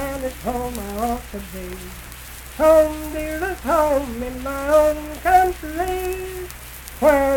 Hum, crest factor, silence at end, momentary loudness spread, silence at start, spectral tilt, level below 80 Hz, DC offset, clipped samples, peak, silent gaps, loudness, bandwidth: none; 18 dB; 0 s; 18 LU; 0 s; -5 dB/octave; -36 dBFS; under 0.1%; under 0.1%; -4 dBFS; none; -20 LUFS; 19 kHz